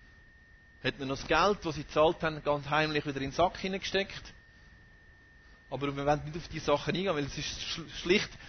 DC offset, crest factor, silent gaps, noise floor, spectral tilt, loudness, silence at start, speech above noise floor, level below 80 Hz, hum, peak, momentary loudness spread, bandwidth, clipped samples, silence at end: under 0.1%; 20 dB; none; -58 dBFS; -4.5 dB/octave; -31 LUFS; 0.8 s; 27 dB; -52 dBFS; none; -12 dBFS; 9 LU; 6.6 kHz; under 0.1%; 0 s